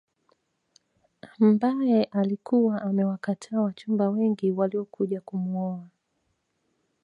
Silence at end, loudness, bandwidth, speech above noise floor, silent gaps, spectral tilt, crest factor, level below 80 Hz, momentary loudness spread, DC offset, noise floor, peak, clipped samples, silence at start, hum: 1.15 s; -26 LUFS; 8.8 kHz; 50 dB; none; -8.5 dB/octave; 16 dB; -76 dBFS; 8 LU; under 0.1%; -75 dBFS; -10 dBFS; under 0.1%; 1.25 s; none